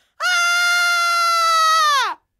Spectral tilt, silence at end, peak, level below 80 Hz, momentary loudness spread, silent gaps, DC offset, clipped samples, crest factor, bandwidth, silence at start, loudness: 5 dB/octave; 0.25 s; -8 dBFS; -82 dBFS; 3 LU; none; under 0.1%; under 0.1%; 10 dB; 16 kHz; 0.2 s; -15 LUFS